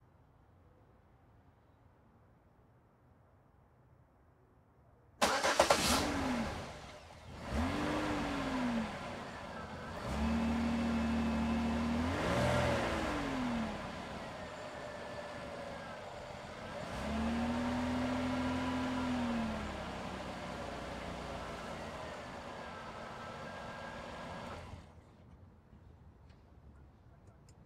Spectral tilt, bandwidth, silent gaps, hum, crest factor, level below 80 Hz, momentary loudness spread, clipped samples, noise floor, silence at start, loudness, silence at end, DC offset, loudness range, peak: -4.5 dB/octave; 16 kHz; none; none; 28 dB; -52 dBFS; 14 LU; under 0.1%; -66 dBFS; 0.65 s; -37 LUFS; 0 s; under 0.1%; 12 LU; -12 dBFS